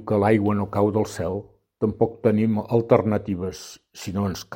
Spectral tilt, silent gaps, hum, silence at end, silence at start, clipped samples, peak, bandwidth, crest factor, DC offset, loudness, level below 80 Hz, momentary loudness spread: -7.5 dB/octave; none; none; 0 s; 0 s; under 0.1%; -2 dBFS; 16.5 kHz; 22 dB; under 0.1%; -23 LUFS; -52 dBFS; 13 LU